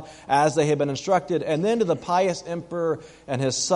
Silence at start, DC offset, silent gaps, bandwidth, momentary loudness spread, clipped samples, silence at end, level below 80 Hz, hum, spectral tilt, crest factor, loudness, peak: 0 s; under 0.1%; none; 11.5 kHz; 9 LU; under 0.1%; 0 s; -60 dBFS; none; -4.5 dB/octave; 16 dB; -24 LUFS; -6 dBFS